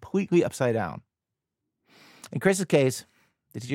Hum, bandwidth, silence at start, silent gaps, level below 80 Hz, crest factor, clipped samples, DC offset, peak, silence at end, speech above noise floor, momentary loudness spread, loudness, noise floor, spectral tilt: none; 16.5 kHz; 0 s; none; -64 dBFS; 20 dB; under 0.1%; under 0.1%; -8 dBFS; 0 s; 62 dB; 18 LU; -25 LUFS; -87 dBFS; -5.5 dB/octave